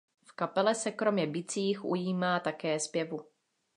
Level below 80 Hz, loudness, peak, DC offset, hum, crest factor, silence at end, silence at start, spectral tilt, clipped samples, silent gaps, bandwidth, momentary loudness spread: -84 dBFS; -32 LUFS; -14 dBFS; under 0.1%; none; 18 dB; 0.55 s; 0.3 s; -4.5 dB/octave; under 0.1%; none; 11 kHz; 8 LU